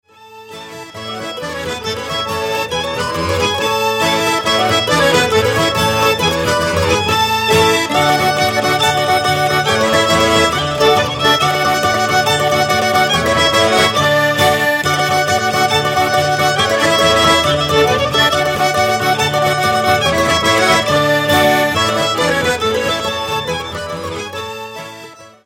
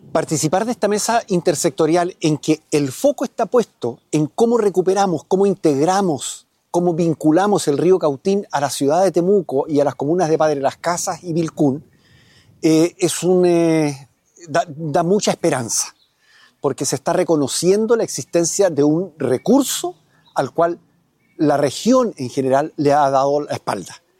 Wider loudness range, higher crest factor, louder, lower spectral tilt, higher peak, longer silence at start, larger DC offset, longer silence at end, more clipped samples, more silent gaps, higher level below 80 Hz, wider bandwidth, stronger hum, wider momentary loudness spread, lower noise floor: about the same, 4 LU vs 2 LU; about the same, 14 dB vs 14 dB; first, -13 LUFS vs -18 LUFS; second, -3.5 dB/octave vs -5 dB/octave; first, 0 dBFS vs -4 dBFS; about the same, 0.2 s vs 0.15 s; neither; about the same, 0.2 s vs 0.25 s; neither; neither; first, -40 dBFS vs -62 dBFS; about the same, 16.5 kHz vs 16.5 kHz; neither; first, 11 LU vs 7 LU; second, -37 dBFS vs -60 dBFS